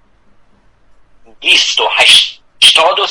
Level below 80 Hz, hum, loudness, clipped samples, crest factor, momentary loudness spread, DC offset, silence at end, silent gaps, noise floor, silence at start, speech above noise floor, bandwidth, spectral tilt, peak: -52 dBFS; none; -7 LUFS; 0.8%; 12 dB; 8 LU; under 0.1%; 0 s; none; -47 dBFS; 1.4 s; 38 dB; over 20 kHz; 1.5 dB/octave; 0 dBFS